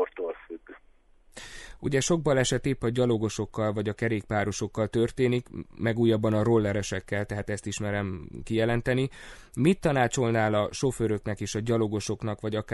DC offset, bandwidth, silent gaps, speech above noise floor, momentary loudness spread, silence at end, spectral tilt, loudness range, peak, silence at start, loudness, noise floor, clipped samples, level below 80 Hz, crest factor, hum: under 0.1%; 11.5 kHz; none; 31 dB; 11 LU; 0 s; -5.5 dB/octave; 2 LU; -10 dBFS; 0 s; -27 LUFS; -58 dBFS; under 0.1%; -48 dBFS; 18 dB; none